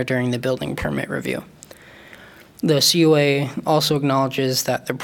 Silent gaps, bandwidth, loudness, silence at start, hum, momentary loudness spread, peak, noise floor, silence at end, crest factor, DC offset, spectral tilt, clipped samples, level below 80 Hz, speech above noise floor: none; 18 kHz; -19 LUFS; 0 s; none; 10 LU; -4 dBFS; -44 dBFS; 0 s; 16 dB; under 0.1%; -4.5 dB/octave; under 0.1%; -48 dBFS; 25 dB